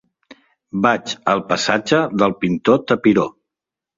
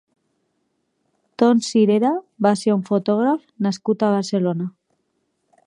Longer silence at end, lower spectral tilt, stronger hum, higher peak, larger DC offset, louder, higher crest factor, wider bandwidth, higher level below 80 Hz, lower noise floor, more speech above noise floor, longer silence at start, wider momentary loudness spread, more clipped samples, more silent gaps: second, 0.65 s vs 1 s; second, -5 dB/octave vs -6.5 dB/octave; neither; about the same, -2 dBFS vs -2 dBFS; neither; about the same, -17 LUFS vs -19 LUFS; about the same, 18 dB vs 18 dB; second, 7.8 kHz vs 11 kHz; first, -56 dBFS vs -72 dBFS; first, -86 dBFS vs -71 dBFS; first, 69 dB vs 52 dB; second, 0.75 s vs 1.4 s; second, 4 LU vs 7 LU; neither; neither